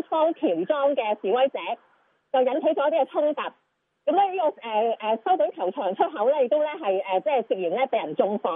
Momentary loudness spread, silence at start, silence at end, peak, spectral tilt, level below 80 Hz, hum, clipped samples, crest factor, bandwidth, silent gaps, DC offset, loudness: 5 LU; 0.1 s; 0 s; -8 dBFS; -8.5 dB/octave; under -90 dBFS; none; under 0.1%; 16 dB; 3.9 kHz; none; under 0.1%; -24 LUFS